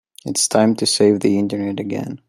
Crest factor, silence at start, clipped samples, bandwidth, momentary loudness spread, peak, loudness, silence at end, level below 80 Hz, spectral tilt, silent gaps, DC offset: 16 dB; 0.25 s; under 0.1%; 15 kHz; 9 LU; -2 dBFS; -17 LUFS; 0.15 s; -62 dBFS; -4 dB/octave; none; under 0.1%